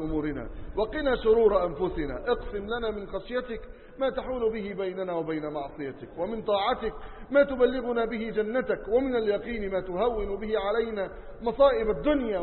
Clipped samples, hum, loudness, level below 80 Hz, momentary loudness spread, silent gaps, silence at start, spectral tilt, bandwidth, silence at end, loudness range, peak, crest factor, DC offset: under 0.1%; none; -28 LUFS; -44 dBFS; 12 LU; none; 0 s; -10 dB/octave; 4.3 kHz; 0 s; 5 LU; -10 dBFS; 18 dB; under 0.1%